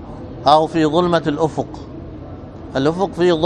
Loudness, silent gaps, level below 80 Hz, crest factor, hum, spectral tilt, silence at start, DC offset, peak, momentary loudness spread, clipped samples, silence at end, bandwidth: -17 LUFS; none; -42 dBFS; 18 dB; none; -6.5 dB/octave; 0 s; under 0.1%; 0 dBFS; 19 LU; under 0.1%; 0 s; 9.8 kHz